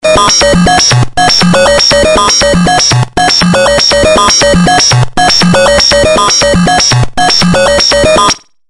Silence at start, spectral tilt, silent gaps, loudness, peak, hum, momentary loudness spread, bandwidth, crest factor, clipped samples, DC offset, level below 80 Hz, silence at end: 0.05 s; -3.5 dB/octave; none; -5 LUFS; 0 dBFS; none; 3 LU; 11.5 kHz; 6 dB; 0.3%; under 0.1%; -24 dBFS; 0.3 s